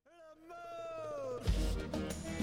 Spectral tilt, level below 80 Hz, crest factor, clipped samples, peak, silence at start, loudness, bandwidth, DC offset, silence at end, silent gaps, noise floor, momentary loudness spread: -5.5 dB/octave; -42 dBFS; 18 dB; under 0.1%; -22 dBFS; 0.1 s; -40 LUFS; 16.5 kHz; under 0.1%; 0 s; none; -58 dBFS; 16 LU